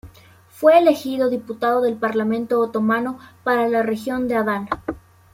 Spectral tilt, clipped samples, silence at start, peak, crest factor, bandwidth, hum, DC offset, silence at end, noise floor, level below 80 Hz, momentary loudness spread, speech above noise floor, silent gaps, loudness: -6 dB/octave; under 0.1%; 0.05 s; -2 dBFS; 18 dB; 16.5 kHz; none; under 0.1%; 0.35 s; -48 dBFS; -54 dBFS; 13 LU; 29 dB; none; -20 LUFS